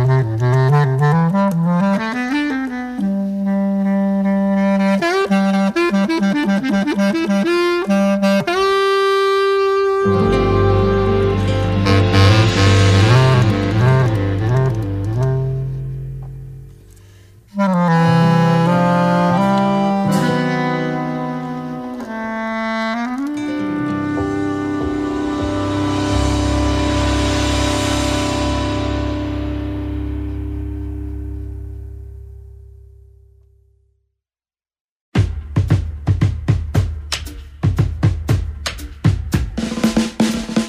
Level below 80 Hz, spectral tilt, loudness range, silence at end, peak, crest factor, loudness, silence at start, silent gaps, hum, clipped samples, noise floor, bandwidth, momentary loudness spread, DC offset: -30 dBFS; -6.5 dB/octave; 10 LU; 0 s; 0 dBFS; 16 dB; -17 LUFS; 0 s; 34.81-35.12 s; none; under 0.1%; under -90 dBFS; 15 kHz; 12 LU; under 0.1%